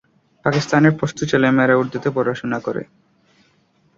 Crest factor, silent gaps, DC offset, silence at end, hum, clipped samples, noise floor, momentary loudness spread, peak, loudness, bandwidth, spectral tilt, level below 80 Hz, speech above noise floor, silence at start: 18 dB; none; under 0.1%; 1.15 s; none; under 0.1%; -60 dBFS; 9 LU; -2 dBFS; -18 LUFS; 7.8 kHz; -6.5 dB/octave; -56 dBFS; 42 dB; 0.45 s